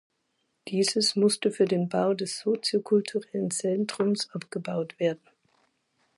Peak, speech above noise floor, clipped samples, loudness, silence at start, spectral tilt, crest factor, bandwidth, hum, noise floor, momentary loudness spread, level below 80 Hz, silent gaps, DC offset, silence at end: -12 dBFS; 49 dB; under 0.1%; -27 LUFS; 0.65 s; -4.5 dB/octave; 16 dB; 11.5 kHz; none; -76 dBFS; 9 LU; -76 dBFS; none; under 0.1%; 1 s